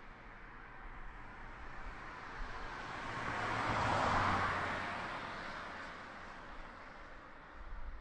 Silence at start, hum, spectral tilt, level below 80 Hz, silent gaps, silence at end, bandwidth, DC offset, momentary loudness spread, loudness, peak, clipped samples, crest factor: 0 s; none; -5 dB/octave; -52 dBFS; none; 0 s; 11.5 kHz; under 0.1%; 19 LU; -39 LUFS; -22 dBFS; under 0.1%; 18 dB